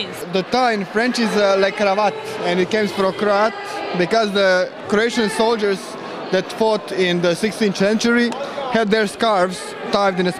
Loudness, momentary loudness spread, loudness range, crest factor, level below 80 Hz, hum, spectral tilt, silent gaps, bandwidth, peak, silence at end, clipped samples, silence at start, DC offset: -18 LUFS; 6 LU; 1 LU; 16 dB; -56 dBFS; none; -4.5 dB/octave; none; 14.5 kHz; -2 dBFS; 0 s; under 0.1%; 0 s; under 0.1%